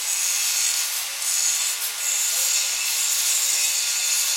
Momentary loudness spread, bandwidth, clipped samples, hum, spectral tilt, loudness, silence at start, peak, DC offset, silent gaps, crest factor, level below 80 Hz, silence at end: 4 LU; 16.5 kHz; under 0.1%; none; 6 dB/octave; -20 LUFS; 0 s; -8 dBFS; under 0.1%; none; 16 dB; under -90 dBFS; 0 s